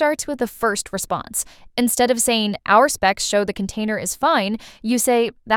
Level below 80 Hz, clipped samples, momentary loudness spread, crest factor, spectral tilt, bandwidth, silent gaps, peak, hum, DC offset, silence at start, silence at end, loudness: -50 dBFS; under 0.1%; 9 LU; 18 dB; -3 dB/octave; 19.5 kHz; none; -2 dBFS; none; under 0.1%; 0 s; 0 s; -20 LUFS